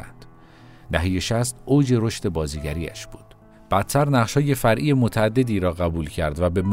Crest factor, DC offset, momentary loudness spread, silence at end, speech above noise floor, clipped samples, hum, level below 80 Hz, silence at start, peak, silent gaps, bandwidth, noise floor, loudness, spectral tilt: 18 dB; under 0.1%; 9 LU; 0 s; 26 dB; under 0.1%; none; -38 dBFS; 0 s; -4 dBFS; none; 16 kHz; -47 dBFS; -22 LUFS; -6 dB/octave